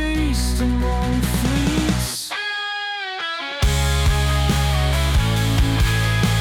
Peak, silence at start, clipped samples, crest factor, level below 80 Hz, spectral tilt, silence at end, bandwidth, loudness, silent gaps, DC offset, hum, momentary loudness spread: -8 dBFS; 0 s; under 0.1%; 10 dB; -24 dBFS; -4.5 dB/octave; 0 s; 18 kHz; -20 LUFS; none; under 0.1%; none; 6 LU